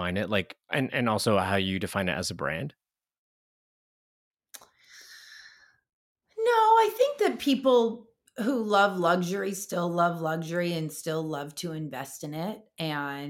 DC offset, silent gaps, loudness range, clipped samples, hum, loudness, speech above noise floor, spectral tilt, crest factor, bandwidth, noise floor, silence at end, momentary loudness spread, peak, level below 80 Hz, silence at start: under 0.1%; 3.18-4.31 s, 5.93-6.15 s; 10 LU; under 0.1%; none; -27 LUFS; 28 dB; -5 dB/octave; 18 dB; 17 kHz; -55 dBFS; 0 s; 14 LU; -10 dBFS; -66 dBFS; 0 s